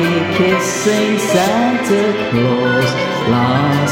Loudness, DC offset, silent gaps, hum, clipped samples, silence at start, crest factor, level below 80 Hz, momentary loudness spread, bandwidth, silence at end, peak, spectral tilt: -14 LUFS; under 0.1%; none; none; under 0.1%; 0 s; 12 dB; -48 dBFS; 2 LU; 17 kHz; 0 s; -2 dBFS; -5 dB/octave